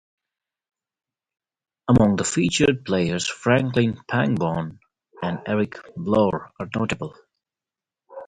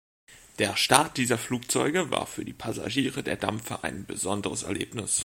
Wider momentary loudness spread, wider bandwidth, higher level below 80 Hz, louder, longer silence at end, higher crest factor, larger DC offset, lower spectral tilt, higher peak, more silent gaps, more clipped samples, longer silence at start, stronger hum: about the same, 12 LU vs 12 LU; second, 9.6 kHz vs 16.5 kHz; first, -48 dBFS vs -58 dBFS; first, -22 LUFS vs -27 LUFS; about the same, 0 s vs 0 s; second, 20 dB vs 28 dB; neither; first, -5.5 dB/octave vs -3 dB/octave; second, -4 dBFS vs 0 dBFS; neither; neither; first, 1.85 s vs 0.3 s; neither